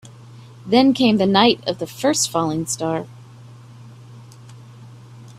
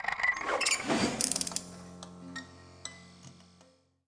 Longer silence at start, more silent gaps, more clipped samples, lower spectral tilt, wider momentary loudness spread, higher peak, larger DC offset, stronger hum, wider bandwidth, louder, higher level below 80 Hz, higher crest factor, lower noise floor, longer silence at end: about the same, 0.05 s vs 0 s; neither; neither; first, -4 dB/octave vs -2 dB/octave; second, 12 LU vs 20 LU; first, 0 dBFS vs -6 dBFS; neither; neither; first, 15 kHz vs 10.5 kHz; first, -18 LUFS vs -30 LUFS; first, -58 dBFS vs -64 dBFS; second, 20 dB vs 30 dB; second, -42 dBFS vs -64 dBFS; second, 0.05 s vs 0.65 s